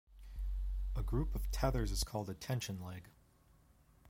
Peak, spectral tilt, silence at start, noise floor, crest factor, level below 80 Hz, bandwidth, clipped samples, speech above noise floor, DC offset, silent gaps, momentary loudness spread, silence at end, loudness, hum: -18 dBFS; -5 dB/octave; 0.1 s; -67 dBFS; 20 dB; -42 dBFS; 16.5 kHz; under 0.1%; 30 dB; under 0.1%; none; 11 LU; 0 s; -40 LUFS; none